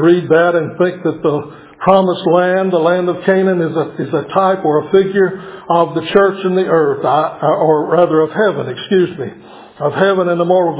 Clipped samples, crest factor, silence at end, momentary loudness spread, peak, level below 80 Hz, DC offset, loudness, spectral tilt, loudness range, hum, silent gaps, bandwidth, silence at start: under 0.1%; 14 dB; 0 s; 7 LU; 0 dBFS; -56 dBFS; under 0.1%; -14 LUFS; -10.5 dB/octave; 1 LU; none; none; 4 kHz; 0 s